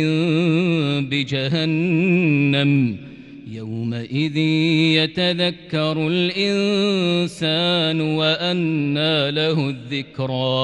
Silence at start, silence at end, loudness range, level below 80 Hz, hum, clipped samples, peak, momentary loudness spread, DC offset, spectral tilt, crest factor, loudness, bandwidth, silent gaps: 0 s; 0 s; 1 LU; -58 dBFS; none; under 0.1%; -4 dBFS; 9 LU; under 0.1%; -6.5 dB/octave; 14 dB; -19 LUFS; 11.5 kHz; none